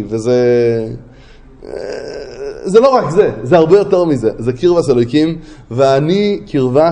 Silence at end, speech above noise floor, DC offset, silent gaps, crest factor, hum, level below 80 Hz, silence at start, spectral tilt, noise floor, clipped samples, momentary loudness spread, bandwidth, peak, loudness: 0 s; 26 dB; under 0.1%; none; 12 dB; none; -42 dBFS; 0 s; -7 dB/octave; -39 dBFS; under 0.1%; 16 LU; 10.5 kHz; 0 dBFS; -12 LUFS